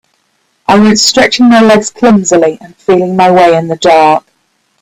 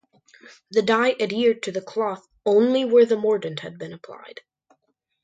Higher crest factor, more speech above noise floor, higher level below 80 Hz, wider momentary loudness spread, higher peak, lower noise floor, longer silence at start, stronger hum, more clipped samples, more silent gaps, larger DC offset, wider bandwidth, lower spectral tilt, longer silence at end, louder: second, 8 dB vs 18 dB; about the same, 51 dB vs 50 dB; first, -46 dBFS vs -70 dBFS; second, 7 LU vs 20 LU; first, 0 dBFS vs -4 dBFS; second, -57 dBFS vs -72 dBFS; about the same, 0.7 s vs 0.7 s; neither; first, 0.3% vs under 0.1%; neither; neither; first, 16 kHz vs 9 kHz; about the same, -4 dB/octave vs -5 dB/octave; second, 0.65 s vs 0.95 s; first, -7 LUFS vs -21 LUFS